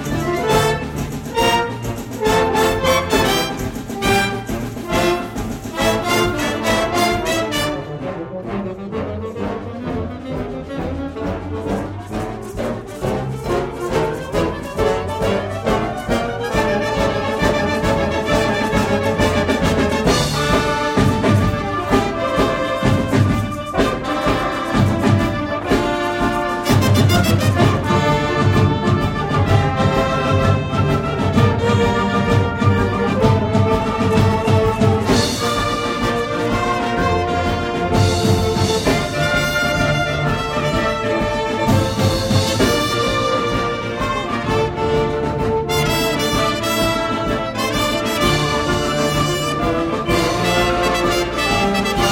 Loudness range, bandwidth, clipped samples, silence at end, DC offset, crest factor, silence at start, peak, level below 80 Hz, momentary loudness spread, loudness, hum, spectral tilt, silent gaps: 6 LU; 17 kHz; under 0.1%; 0 s; under 0.1%; 16 dB; 0 s; 0 dBFS; -32 dBFS; 9 LU; -18 LUFS; none; -5.5 dB/octave; none